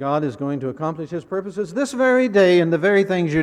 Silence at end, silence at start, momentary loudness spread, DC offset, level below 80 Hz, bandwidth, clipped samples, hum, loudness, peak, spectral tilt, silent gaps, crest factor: 0 s; 0 s; 12 LU; under 0.1%; -54 dBFS; 11.5 kHz; under 0.1%; none; -19 LUFS; -6 dBFS; -6.5 dB/octave; none; 14 dB